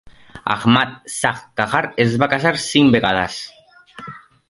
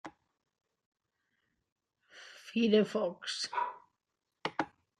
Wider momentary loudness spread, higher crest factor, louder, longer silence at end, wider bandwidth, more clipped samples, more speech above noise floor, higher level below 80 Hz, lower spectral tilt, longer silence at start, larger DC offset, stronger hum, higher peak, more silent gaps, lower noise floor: second, 21 LU vs 24 LU; about the same, 18 dB vs 22 dB; first, -17 LUFS vs -33 LUFS; about the same, 0.3 s vs 0.3 s; about the same, 11.5 kHz vs 11 kHz; neither; second, 23 dB vs 56 dB; first, -50 dBFS vs -82 dBFS; about the same, -4.5 dB/octave vs -4.5 dB/octave; about the same, 0.05 s vs 0.05 s; neither; neither; first, 0 dBFS vs -16 dBFS; second, none vs 0.86-0.92 s, 1.72-1.76 s; second, -40 dBFS vs -87 dBFS